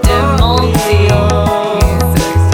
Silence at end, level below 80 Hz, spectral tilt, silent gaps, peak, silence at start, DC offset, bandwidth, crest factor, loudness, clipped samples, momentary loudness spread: 0 s; -18 dBFS; -5.5 dB/octave; none; 0 dBFS; 0 s; under 0.1%; 18 kHz; 10 dB; -11 LUFS; under 0.1%; 2 LU